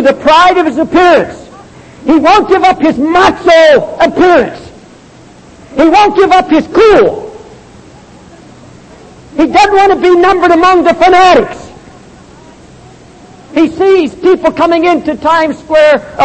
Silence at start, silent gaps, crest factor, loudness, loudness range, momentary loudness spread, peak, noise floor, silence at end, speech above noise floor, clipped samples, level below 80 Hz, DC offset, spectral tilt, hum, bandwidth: 0 s; none; 8 dB; -7 LUFS; 4 LU; 8 LU; 0 dBFS; -36 dBFS; 0 s; 29 dB; 0.4%; -38 dBFS; under 0.1%; -4.5 dB/octave; none; 8.8 kHz